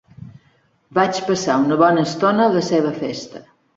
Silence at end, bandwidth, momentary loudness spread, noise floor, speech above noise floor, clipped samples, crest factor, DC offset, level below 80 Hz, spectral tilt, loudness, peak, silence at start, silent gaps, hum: 0.35 s; 8 kHz; 12 LU; -59 dBFS; 42 dB; under 0.1%; 18 dB; under 0.1%; -60 dBFS; -5.5 dB/octave; -18 LUFS; -2 dBFS; 0.2 s; none; none